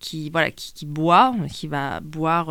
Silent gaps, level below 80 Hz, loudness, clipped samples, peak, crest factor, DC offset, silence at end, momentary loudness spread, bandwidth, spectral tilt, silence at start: none; -52 dBFS; -21 LUFS; under 0.1%; -2 dBFS; 18 dB; under 0.1%; 0 s; 13 LU; 17.5 kHz; -5.5 dB/octave; 0 s